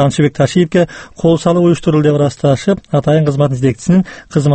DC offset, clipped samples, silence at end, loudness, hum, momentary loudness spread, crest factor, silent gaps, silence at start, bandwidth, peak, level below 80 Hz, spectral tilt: under 0.1%; under 0.1%; 0 s; -13 LUFS; none; 4 LU; 12 dB; none; 0 s; 8.8 kHz; 0 dBFS; -42 dBFS; -7 dB/octave